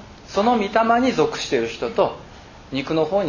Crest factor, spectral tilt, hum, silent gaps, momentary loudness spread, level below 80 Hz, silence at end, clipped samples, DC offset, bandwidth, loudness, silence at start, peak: 18 dB; -5 dB/octave; none; none; 10 LU; -48 dBFS; 0 s; under 0.1%; under 0.1%; 7.4 kHz; -21 LUFS; 0 s; -4 dBFS